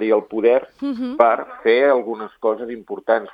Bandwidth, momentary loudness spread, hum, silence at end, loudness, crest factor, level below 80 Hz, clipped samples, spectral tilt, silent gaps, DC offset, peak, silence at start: 5.2 kHz; 12 LU; none; 0 s; -19 LUFS; 18 dB; -64 dBFS; under 0.1%; -7 dB/octave; none; under 0.1%; 0 dBFS; 0 s